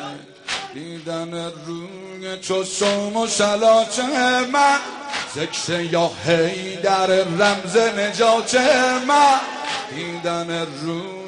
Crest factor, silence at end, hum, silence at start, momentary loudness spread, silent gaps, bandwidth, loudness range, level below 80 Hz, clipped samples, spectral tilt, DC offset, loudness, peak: 16 dB; 0 s; none; 0 s; 14 LU; none; 10.5 kHz; 4 LU; -60 dBFS; under 0.1%; -3 dB/octave; under 0.1%; -19 LUFS; -4 dBFS